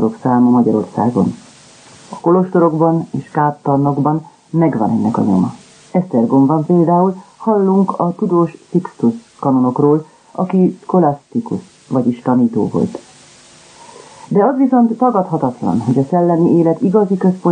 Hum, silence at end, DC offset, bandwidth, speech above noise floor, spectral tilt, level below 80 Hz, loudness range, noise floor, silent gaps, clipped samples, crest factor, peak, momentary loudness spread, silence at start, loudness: none; 0 s; under 0.1%; 9.6 kHz; 29 dB; -9.5 dB/octave; -58 dBFS; 2 LU; -43 dBFS; none; under 0.1%; 14 dB; 0 dBFS; 9 LU; 0 s; -15 LUFS